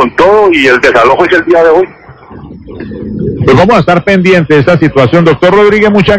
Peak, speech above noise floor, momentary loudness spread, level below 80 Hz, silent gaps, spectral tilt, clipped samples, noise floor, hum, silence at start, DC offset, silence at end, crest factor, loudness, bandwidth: 0 dBFS; 23 dB; 11 LU; -32 dBFS; none; -7 dB/octave; 10%; -29 dBFS; none; 0 s; under 0.1%; 0 s; 6 dB; -6 LUFS; 8 kHz